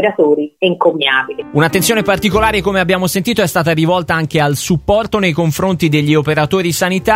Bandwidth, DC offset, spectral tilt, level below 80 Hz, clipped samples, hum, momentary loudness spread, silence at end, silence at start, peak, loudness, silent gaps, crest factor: 16.5 kHz; under 0.1%; -5 dB/octave; -36 dBFS; under 0.1%; none; 3 LU; 0 s; 0 s; 0 dBFS; -13 LUFS; none; 14 dB